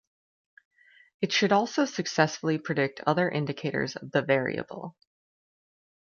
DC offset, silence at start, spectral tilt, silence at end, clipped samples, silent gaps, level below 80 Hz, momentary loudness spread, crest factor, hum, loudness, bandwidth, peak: under 0.1%; 1.2 s; -5 dB/octave; 1.25 s; under 0.1%; none; -70 dBFS; 10 LU; 24 dB; none; -27 LUFS; 7.2 kHz; -6 dBFS